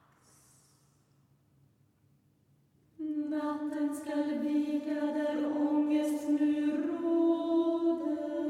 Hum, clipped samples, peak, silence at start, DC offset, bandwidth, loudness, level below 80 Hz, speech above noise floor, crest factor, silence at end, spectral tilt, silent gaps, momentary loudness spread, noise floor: none; under 0.1%; -18 dBFS; 3 s; under 0.1%; 13 kHz; -31 LUFS; -78 dBFS; 38 dB; 14 dB; 0 s; -5 dB/octave; none; 6 LU; -69 dBFS